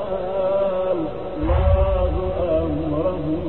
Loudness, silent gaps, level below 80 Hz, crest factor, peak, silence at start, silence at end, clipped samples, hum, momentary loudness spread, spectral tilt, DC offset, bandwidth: -22 LUFS; none; -26 dBFS; 14 dB; -6 dBFS; 0 s; 0 s; under 0.1%; none; 6 LU; -11.5 dB/octave; 2%; 4.2 kHz